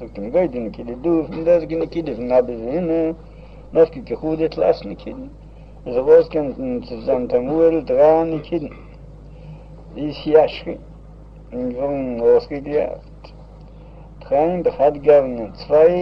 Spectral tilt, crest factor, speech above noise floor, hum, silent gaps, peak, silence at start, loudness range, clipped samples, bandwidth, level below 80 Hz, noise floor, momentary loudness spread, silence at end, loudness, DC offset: -9 dB/octave; 18 dB; 22 dB; none; none; -2 dBFS; 0 s; 5 LU; under 0.1%; 5.8 kHz; -42 dBFS; -40 dBFS; 18 LU; 0 s; -19 LUFS; under 0.1%